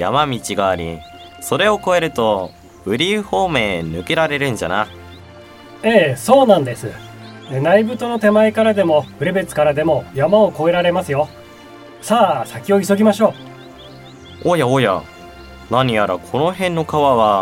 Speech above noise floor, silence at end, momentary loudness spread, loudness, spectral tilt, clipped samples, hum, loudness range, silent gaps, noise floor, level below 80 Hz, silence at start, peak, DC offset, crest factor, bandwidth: 23 dB; 0 s; 13 LU; -16 LUFS; -5.5 dB/octave; under 0.1%; none; 4 LU; none; -39 dBFS; -48 dBFS; 0 s; 0 dBFS; under 0.1%; 16 dB; 16.5 kHz